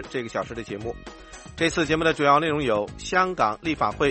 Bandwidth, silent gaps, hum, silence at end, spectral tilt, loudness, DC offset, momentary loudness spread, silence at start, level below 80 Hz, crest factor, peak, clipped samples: 8.8 kHz; none; none; 0 s; -4.5 dB/octave; -24 LUFS; under 0.1%; 17 LU; 0 s; -46 dBFS; 20 dB; -4 dBFS; under 0.1%